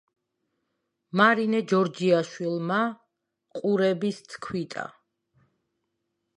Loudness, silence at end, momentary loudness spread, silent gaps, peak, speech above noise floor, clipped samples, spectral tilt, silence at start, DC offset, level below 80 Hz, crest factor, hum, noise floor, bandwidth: -25 LUFS; 1.45 s; 15 LU; none; -6 dBFS; 55 dB; under 0.1%; -6 dB/octave; 1.15 s; under 0.1%; -72 dBFS; 22 dB; none; -79 dBFS; 11 kHz